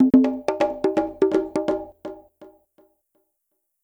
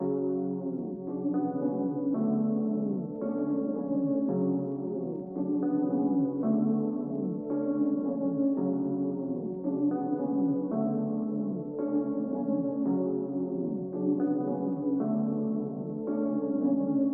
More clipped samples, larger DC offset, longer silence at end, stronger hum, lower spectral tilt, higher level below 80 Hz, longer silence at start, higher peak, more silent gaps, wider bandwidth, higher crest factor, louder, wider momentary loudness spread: neither; neither; first, 1.4 s vs 0 s; neither; second, -7 dB/octave vs -14.5 dB/octave; first, -54 dBFS vs -72 dBFS; about the same, 0 s vs 0 s; first, -6 dBFS vs -16 dBFS; neither; first, 9.2 kHz vs 1.8 kHz; first, 18 dB vs 12 dB; first, -22 LUFS vs -30 LUFS; first, 21 LU vs 5 LU